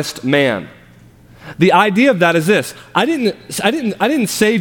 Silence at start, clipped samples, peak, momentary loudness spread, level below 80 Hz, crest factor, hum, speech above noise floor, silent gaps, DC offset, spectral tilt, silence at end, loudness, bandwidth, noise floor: 0 s; under 0.1%; 0 dBFS; 7 LU; -54 dBFS; 16 dB; none; 29 dB; none; under 0.1%; -4.5 dB/octave; 0 s; -15 LUFS; 18.5 kHz; -44 dBFS